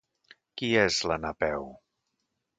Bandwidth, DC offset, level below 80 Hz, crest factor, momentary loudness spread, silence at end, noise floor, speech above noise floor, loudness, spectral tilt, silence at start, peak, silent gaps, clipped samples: 9.4 kHz; under 0.1%; -54 dBFS; 22 dB; 18 LU; 0.85 s; -81 dBFS; 53 dB; -28 LUFS; -3.5 dB/octave; 0.55 s; -8 dBFS; none; under 0.1%